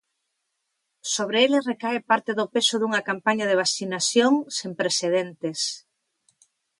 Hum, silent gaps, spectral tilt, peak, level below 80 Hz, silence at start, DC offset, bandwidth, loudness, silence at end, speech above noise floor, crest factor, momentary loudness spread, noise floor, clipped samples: none; none; -2.5 dB/octave; -6 dBFS; -76 dBFS; 1.05 s; under 0.1%; 11.5 kHz; -23 LUFS; 1 s; 54 dB; 18 dB; 8 LU; -78 dBFS; under 0.1%